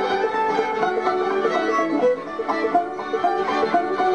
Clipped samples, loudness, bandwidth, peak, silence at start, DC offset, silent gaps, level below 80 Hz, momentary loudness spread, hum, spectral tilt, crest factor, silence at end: under 0.1%; -21 LUFS; 9.8 kHz; -8 dBFS; 0 s; 0.2%; none; -62 dBFS; 3 LU; none; -5 dB/octave; 14 dB; 0 s